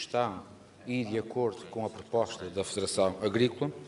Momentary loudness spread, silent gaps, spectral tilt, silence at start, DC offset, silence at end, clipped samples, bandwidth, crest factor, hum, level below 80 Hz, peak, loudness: 9 LU; none; -5 dB/octave; 0 s; under 0.1%; 0 s; under 0.1%; 11.5 kHz; 20 dB; none; -66 dBFS; -12 dBFS; -32 LUFS